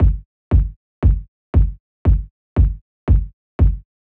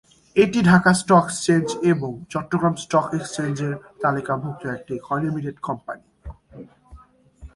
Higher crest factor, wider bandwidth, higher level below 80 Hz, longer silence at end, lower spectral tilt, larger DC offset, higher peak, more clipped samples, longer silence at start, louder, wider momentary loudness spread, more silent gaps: second, 14 dB vs 22 dB; second, 3 kHz vs 11.5 kHz; first, -18 dBFS vs -50 dBFS; first, 0.3 s vs 0.1 s; first, -11.5 dB/octave vs -6 dB/octave; neither; second, -4 dBFS vs 0 dBFS; neither; second, 0 s vs 0.35 s; about the same, -20 LUFS vs -21 LUFS; second, 8 LU vs 15 LU; first, 0.25-0.51 s, 0.76-1.02 s, 1.28-1.53 s, 1.80-2.05 s, 2.31-2.56 s, 2.81-3.07 s, 3.33-3.59 s vs none